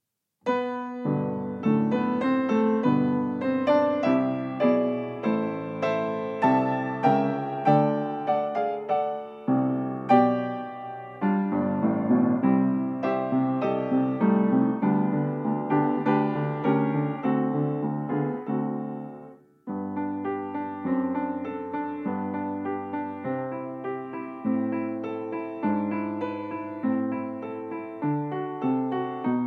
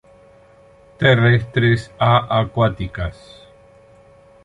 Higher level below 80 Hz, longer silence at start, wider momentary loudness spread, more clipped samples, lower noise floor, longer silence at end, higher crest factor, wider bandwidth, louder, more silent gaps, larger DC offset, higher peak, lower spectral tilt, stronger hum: second, -74 dBFS vs -40 dBFS; second, 0.45 s vs 1 s; about the same, 10 LU vs 12 LU; neither; about the same, -48 dBFS vs -48 dBFS; second, 0 s vs 1.3 s; about the same, 20 dB vs 18 dB; second, 6.2 kHz vs 9 kHz; second, -26 LUFS vs -17 LUFS; neither; neither; second, -6 dBFS vs -2 dBFS; first, -9.5 dB/octave vs -7.5 dB/octave; neither